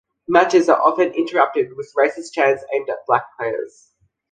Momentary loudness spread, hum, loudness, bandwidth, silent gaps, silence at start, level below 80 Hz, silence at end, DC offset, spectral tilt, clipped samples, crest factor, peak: 11 LU; none; -18 LUFS; 9.6 kHz; none; 0.3 s; -64 dBFS; 0.65 s; under 0.1%; -4.5 dB/octave; under 0.1%; 18 dB; -2 dBFS